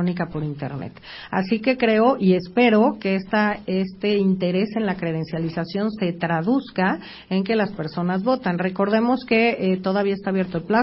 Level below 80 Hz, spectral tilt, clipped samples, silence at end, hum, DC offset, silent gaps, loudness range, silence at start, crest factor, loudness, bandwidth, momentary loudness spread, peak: -56 dBFS; -11.5 dB/octave; under 0.1%; 0 s; none; under 0.1%; none; 4 LU; 0 s; 18 dB; -22 LUFS; 5.8 kHz; 9 LU; -4 dBFS